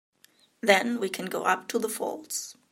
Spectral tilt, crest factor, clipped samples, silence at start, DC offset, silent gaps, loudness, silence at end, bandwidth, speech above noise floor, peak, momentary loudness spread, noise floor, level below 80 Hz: -2.5 dB/octave; 26 dB; under 0.1%; 0.65 s; under 0.1%; none; -27 LUFS; 0.2 s; 16 kHz; 35 dB; -4 dBFS; 11 LU; -62 dBFS; -82 dBFS